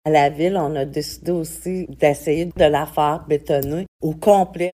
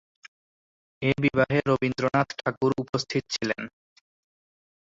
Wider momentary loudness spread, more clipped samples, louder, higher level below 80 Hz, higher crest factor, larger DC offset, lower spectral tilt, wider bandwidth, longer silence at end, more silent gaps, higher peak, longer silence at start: first, 10 LU vs 7 LU; neither; first, -20 LUFS vs -26 LUFS; first, -44 dBFS vs -58 dBFS; about the same, 18 dB vs 20 dB; neither; about the same, -6 dB/octave vs -5.5 dB/octave; first, 16 kHz vs 7.8 kHz; second, 0 s vs 1.2 s; about the same, 3.88-3.99 s vs 2.57-2.61 s, 2.89-2.93 s; first, -2 dBFS vs -8 dBFS; second, 0.05 s vs 1 s